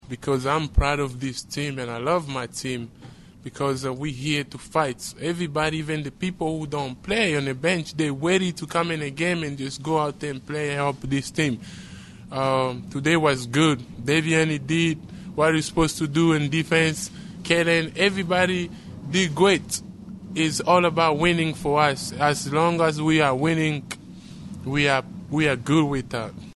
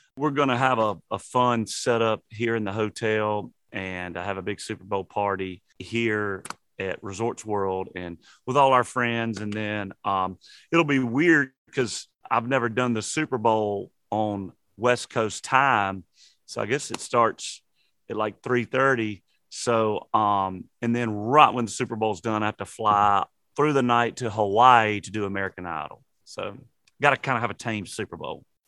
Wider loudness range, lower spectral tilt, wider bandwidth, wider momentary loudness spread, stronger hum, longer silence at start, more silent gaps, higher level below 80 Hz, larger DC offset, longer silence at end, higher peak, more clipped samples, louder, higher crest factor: about the same, 6 LU vs 6 LU; about the same, -5 dB/octave vs -5 dB/octave; about the same, 12.5 kHz vs 12.5 kHz; about the same, 12 LU vs 14 LU; neither; about the same, 0.05 s vs 0.15 s; second, none vs 11.58-11.65 s; first, -42 dBFS vs -66 dBFS; neither; second, 0.05 s vs 0.3 s; second, -4 dBFS vs 0 dBFS; neither; about the same, -23 LUFS vs -25 LUFS; about the same, 20 dB vs 24 dB